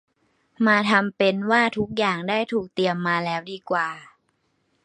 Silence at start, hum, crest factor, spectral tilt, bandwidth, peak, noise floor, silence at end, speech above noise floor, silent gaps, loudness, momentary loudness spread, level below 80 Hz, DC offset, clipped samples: 0.6 s; none; 20 dB; -5.5 dB/octave; 10 kHz; -2 dBFS; -70 dBFS; 0.8 s; 47 dB; none; -22 LUFS; 8 LU; -62 dBFS; under 0.1%; under 0.1%